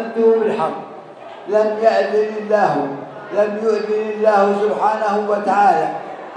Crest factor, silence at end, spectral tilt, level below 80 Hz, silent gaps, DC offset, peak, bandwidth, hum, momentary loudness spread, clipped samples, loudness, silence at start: 16 dB; 0 s; -6 dB/octave; -74 dBFS; none; under 0.1%; -2 dBFS; 9.6 kHz; none; 14 LU; under 0.1%; -17 LUFS; 0 s